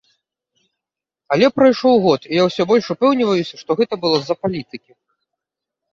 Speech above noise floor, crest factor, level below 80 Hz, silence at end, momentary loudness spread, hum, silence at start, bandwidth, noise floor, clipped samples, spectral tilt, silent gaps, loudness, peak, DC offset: 69 dB; 16 dB; -60 dBFS; 1.15 s; 10 LU; none; 1.3 s; 7.4 kHz; -86 dBFS; under 0.1%; -6 dB/octave; none; -16 LUFS; -2 dBFS; under 0.1%